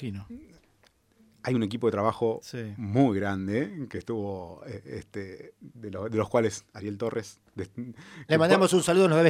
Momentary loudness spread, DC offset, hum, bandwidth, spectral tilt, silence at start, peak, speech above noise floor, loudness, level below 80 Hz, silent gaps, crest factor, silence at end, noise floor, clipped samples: 21 LU; under 0.1%; none; 15.5 kHz; -6 dB/octave; 0 s; -6 dBFS; 37 dB; -27 LUFS; -64 dBFS; none; 22 dB; 0 s; -64 dBFS; under 0.1%